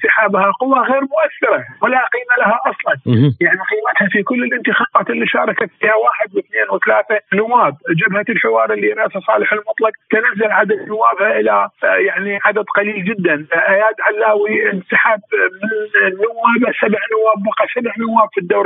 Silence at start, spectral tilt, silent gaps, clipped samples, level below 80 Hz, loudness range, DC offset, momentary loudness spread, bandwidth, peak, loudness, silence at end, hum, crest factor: 0 s; -10.5 dB/octave; none; under 0.1%; -72 dBFS; 1 LU; under 0.1%; 4 LU; 4 kHz; 0 dBFS; -14 LUFS; 0 s; none; 14 dB